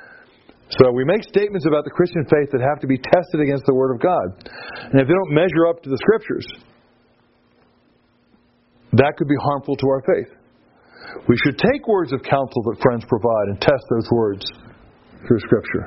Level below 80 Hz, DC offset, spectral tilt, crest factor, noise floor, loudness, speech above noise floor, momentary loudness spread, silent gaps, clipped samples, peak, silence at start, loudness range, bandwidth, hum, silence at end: -50 dBFS; under 0.1%; -6 dB/octave; 20 dB; -59 dBFS; -19 LUFS; 41 dB; 8 LU; none; under 0.1%; 0 dBFS; 0.7 s; 5 LU; 6 kHz; none; 0 s